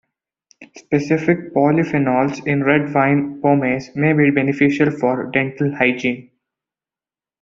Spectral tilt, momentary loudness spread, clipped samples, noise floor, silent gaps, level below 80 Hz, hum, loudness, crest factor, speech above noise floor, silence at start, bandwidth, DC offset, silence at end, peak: -7.5 dB/octave; 6 LU; under 0.1%; under -90 dBFS; none; -56 dBFS; none; -17 LUFS; 18 dB; over 73 dB; 0.6 s; 7.4 kHz; under 0.1%; 1.2 s; -2 dBFS